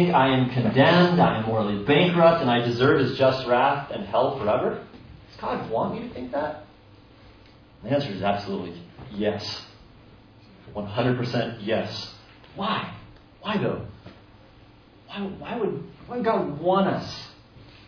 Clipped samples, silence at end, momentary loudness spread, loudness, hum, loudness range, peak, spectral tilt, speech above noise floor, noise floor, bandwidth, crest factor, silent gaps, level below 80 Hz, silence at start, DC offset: under 0.1%; 0.25 s; 19 LU; -24 LUFS; none; 12 LU; -6 dBFS; -7.5 dB/octave; 28 dB; -51 dBFS; 5.4 kHz; 20 dB; none; -54 dBFS; 0 s; under 0.1%